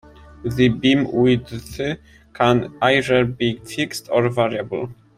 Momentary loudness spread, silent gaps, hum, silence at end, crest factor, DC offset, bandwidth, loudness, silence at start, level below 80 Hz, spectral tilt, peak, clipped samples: 11 LU; none; none; 0.25 s; 18 dB; under 0.1%; 15.5 kHz; -19 LUFS; 0.4 s; -48 dBFS; -6 dB/octave; -2 dBFS; under 0.1%